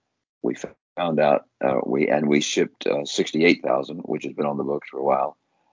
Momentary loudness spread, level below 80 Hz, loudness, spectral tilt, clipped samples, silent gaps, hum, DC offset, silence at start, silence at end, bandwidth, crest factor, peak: 10 LU; -66 dBFS; -23 LUFS; -4.5 dB/octave; under 0.1%; 0.81-0.96 s; none; under 0.1%; 0.45 s; 0.4 s; 7.6 kHz; 20 dB; -4 dBFS